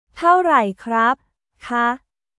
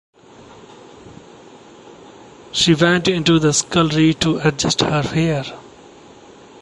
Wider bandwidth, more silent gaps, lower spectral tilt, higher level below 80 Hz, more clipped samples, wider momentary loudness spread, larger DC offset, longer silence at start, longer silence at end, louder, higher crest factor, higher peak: about the same, 11.5 kHz vs 11.5 kHz; neither; about the same, -5.5 dB/octave vs -4.5 dB/octave; second, -60 dBFS vs -46 dBFS; neither; about the same, 11 LU vs 9 LU; neither; second, 0.15 s vs 1.05 s; second, 0.4 s vs 0.95 s; about the same, -18 LUFS vs -16 LUFS; about the same, 18 dB vs 18 dB; about the same, -2 dBFS vs -2 dBFS